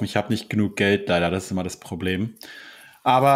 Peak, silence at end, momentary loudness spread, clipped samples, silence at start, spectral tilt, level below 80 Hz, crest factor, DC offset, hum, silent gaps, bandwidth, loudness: -6 dBFS; 0 s; 20 LU; under 0.1%; 0 s; -5.5 dB/octave; -58 dBFS; 18 dB; under 0.1%; none; none; 16 kHz; -23 LUFS